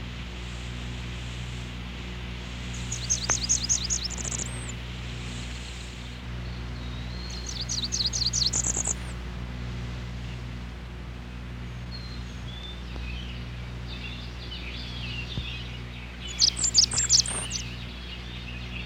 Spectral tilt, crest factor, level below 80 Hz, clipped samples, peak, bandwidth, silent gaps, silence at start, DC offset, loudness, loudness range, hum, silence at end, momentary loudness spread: -2 dB/octave; 24 dB; -38 dBFS; under 0.1%; -6 dBFS; 16 kHz; none; 0 s; under 0.1%; -29 LUFS; 13 LU; 60 Hz at -40 dBFS; 0 s; 15 LU